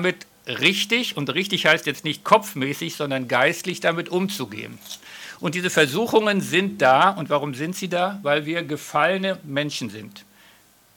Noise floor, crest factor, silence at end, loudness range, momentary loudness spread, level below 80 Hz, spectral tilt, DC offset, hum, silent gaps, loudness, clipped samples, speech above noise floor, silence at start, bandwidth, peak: -54 dBFS; 20 dB; 0.75 s; 4 LU; 14 LU; -70 dBFS; -4 dB/octave; under 0.1%; none; none; -21 LUFS; under 0.1%; 32 dB; 0 s; 18 kHz; -4 dBFS